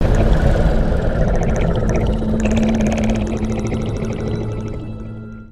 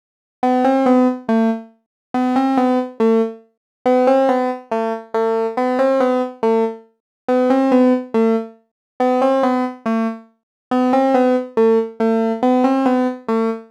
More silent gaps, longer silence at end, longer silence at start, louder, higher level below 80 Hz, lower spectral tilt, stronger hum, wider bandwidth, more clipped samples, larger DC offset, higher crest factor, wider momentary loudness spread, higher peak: second, none vs 1.86-2.14 s, 3.57-3.85 s, 7.00-7.28 s, 8.71-9.00 s, 10.43-10.71 s; about the same, 0 s vs 0.1 s; second, 0 s vs 0.45 s; about the same, -19 LUFS vs -17 LUFS; first, -20 dBFS vs -72 dBFS; about the same, -7.5 dB/octave vs -6.5 dB/octave; neither; first, 11 kHz vs 8.8 kHz; neither; neither; about the same, 16 dB vs 16 dB; first, 11 LU vs 8 LU; about the same, 0 dBFS vs -2 dBFS